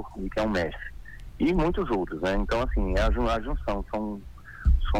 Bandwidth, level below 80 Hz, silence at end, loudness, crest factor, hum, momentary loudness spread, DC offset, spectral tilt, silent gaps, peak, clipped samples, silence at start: 9.4 kHz; -30 dBFS; 0 s; -28 LUFS; 16 dB; none; 15 LU; under 0.1%; -7 dB/octave; none; -10 dBFS; under 0.1%; 0 s